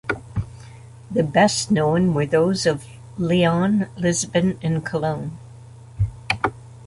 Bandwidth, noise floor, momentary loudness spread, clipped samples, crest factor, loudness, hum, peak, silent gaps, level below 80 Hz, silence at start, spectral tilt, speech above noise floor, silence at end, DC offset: 11.5 kHz; -42 dBFS; 13 LU; under 0.1%; 18 dB; -21 LUFS; none; -2 dBFS; none; -44 dBFS; 0.05 s; -5.5 dB/octave; 22 dB; 0 s; under 0.1%